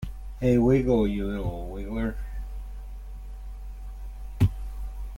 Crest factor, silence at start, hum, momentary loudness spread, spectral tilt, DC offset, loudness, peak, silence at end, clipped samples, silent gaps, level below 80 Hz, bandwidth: 18 dB; 0 s; none; 21 LU; -9 dB/octave; under 0.1%; -26 LUFS; -10 dBFS; 0 s; under 0.1%; none; -36 dBFS; 16.5 kHz